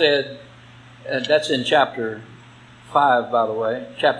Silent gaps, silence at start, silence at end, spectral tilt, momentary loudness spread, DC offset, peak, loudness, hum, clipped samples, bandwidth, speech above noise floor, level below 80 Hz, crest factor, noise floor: none; 0 s; 0 s; -4 dB/octave; 16 LU; under 0.1%; 0 dBFS; -20 LUFS; none; under 0.1%; 10.5 kHz; 26 dB; -64 dBFS; 20 dB; -45 dBFS